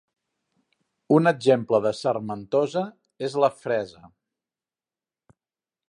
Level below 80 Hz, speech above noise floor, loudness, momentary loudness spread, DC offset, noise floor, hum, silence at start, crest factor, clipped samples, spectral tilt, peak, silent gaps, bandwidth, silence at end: -70 dBFS; over 67 dB; -23 LUFS; 10 LU; under 0.1%; under -90 dBFS; none; 1.1 s; 22 dB; under 0.1%; -6.5 dB/octave; -4 dBFS; none; 11 kHz; 2 s